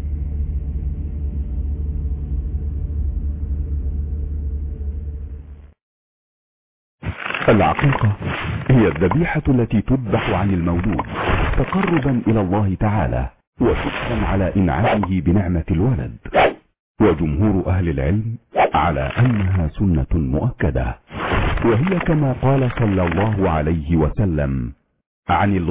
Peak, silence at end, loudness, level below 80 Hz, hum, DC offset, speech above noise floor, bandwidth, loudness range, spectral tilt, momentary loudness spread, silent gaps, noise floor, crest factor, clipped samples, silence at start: -4 dBFS; 0 s; -20 LUFS; -26 dBFS; none; under 0.1%; over 73 dB; 4 kHz; 8 LU; -11.5 dB/octave; 10 LU; 5.82-6.98 s, 13.47-13.53 s, 16.79-16.95 s, 25.06-25.23 s; under -90 dBFS; 14 dB; under 0.1%; 0 s